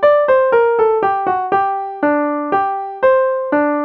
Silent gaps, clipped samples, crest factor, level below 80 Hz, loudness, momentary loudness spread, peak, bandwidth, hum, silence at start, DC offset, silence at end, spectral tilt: none; under 0.1%; 12 dB; -58 dBFS; -15 LUFS; 5 LU; -2 dBFS; 5.4 kHz; none; 0 s; under 0.1%; 0 s; -7.5 dB/octave